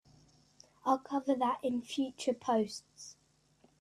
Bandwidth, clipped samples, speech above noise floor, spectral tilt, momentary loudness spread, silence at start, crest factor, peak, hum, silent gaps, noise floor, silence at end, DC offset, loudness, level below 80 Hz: 13 kHz; under 0.1%; 35 dB; -4.5 dB/octave; 17 LU; 0.85 s; 20 dB; -16 dBFS; none; none; -69 dBFS; 0.7 s; under 0.1%; -34 LUFS; -76 dBFS